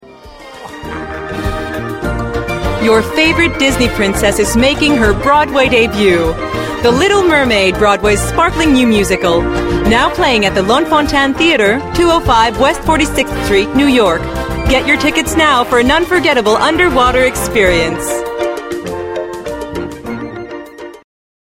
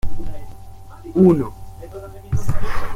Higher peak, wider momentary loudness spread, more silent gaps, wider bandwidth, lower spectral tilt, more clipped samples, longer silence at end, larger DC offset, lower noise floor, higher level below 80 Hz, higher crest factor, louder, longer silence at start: about the same, 0 dBFS vs -2 dBFS; second, 13 LU vs 24 LU; neither; first, 16.5 kHz vs 11.5 kHz; second, -4.5 dB/octave vs -8.5 dB/octave; neither; first, 0.65 s vs 0 s; neither; about the same, -34 dBFS vs -36 dBFS; about the same, -26 dBFS vs -30 dBFS; about the same, 12 dB vs 14 dB; first, -11 LUFS vs -19 LUFS; about the same, 0.05 s vs 0.05 s